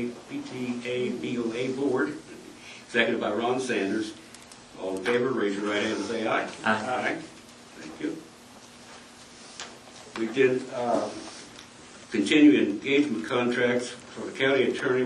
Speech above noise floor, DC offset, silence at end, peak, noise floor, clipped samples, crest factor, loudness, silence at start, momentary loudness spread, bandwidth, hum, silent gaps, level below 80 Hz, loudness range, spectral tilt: 23 dB; under 0.1%; 0 s; -6 dBFS; -49 dBFS; under 0.1%; 22 dB; -27 LUFS; 0 s; 22 LU; 11.5 kHz; none; none; -68 dBFS; 7 LU; -4.5 dB/octave